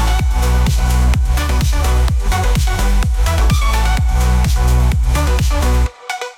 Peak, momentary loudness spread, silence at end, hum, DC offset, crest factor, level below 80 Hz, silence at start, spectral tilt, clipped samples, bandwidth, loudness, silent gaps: -4 dBFS; 2 LU; 0.05 s; none; under 0.1%; 8 dB; -14 dBFS; 0 s; -5 dB/octave; under 0.1%; 16 kHz; -16 LUFS; none